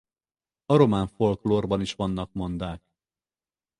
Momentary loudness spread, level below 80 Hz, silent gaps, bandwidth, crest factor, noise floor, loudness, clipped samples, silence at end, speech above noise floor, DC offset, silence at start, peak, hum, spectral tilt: 13 LU; -48 dBFS; none; 11 kHz; 22 dB; under -90 dBFS; -25 LUFS; under 0.1%; 1 s; over 66 dB; under 0.1%; 0.7 s; -4 dBFS; none; -7.5 dB/octave